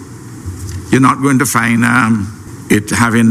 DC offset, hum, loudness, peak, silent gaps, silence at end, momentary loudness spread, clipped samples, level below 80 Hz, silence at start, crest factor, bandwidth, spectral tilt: under 0.1%; none; -12 LUFS; 0 dBFS; none; 0 s; 17 LU; under 0.1%; -40 dBFS; 0 s; 12 dB; 16 kHz; -5 dB/octave